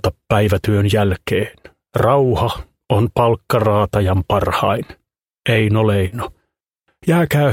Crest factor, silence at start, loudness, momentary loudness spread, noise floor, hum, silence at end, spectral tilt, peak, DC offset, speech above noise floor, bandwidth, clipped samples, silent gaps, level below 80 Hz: 16 dB; 0.05 s; -17 LUFS; 10 LU; -71 dBFS; none; 0 s; -7 dB/octave; 0 dBFS; under 0.1%; 56 dB; 16.5 kHz; under 0.1%; none; -38 dBFS